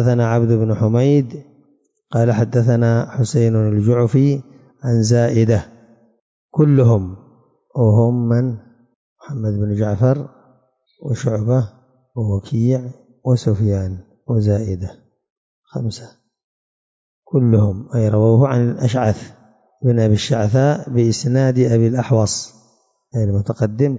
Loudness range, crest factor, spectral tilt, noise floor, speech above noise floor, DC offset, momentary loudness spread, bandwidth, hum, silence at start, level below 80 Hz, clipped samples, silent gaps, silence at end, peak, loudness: 5 LU; 14 dB; -7.5 dB/octave; -59 dBFS; 44 dB; under 0.1%; 13 LU; 7.8 kHz; none; 0 s; -42 dBFS; under 0.1%; 6.21-6.49 s, 8.95-9.16 s, 15.30-15.63 s, 16.44-17.22 s; 0 s; -4 dBFS; -17 LUFS